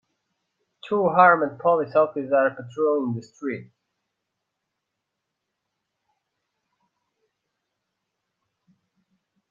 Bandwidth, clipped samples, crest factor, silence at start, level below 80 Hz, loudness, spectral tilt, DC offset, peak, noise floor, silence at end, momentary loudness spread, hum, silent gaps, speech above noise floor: 7.4 kHz; under 0.1%; 24 dB; 0.85 s; -74 dBFS; -22 LUFS; -7.5 dB/octave; under 0.1%; -2 dBFS; -81 dBFS; 5.85 s; 16 LU; none; none; 60 dB